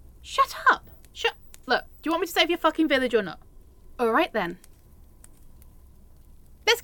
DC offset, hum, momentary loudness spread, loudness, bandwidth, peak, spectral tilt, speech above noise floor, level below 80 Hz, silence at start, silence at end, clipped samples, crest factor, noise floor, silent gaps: under 0.1%; none; 14 LU; -25 LUFS; 17.5 kHz; -6 dBFS; -3 dB/octave; 27 dB; -50 dBFS; 0.25 s; 0 s; under 0.1%; 22 dB; -51 dBFS; none